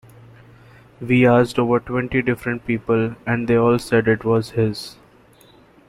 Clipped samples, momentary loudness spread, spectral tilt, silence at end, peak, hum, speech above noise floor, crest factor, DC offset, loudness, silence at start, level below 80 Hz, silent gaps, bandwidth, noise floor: under 0.1%; 9 LU; -7 dB/octave; 0.95 s; -4 dBFS; none; 32 dB; 16 dB; under 0.1%; -19 LUFS; 1 s; -48 dBFS; none; 14 kHz; -50 dBFS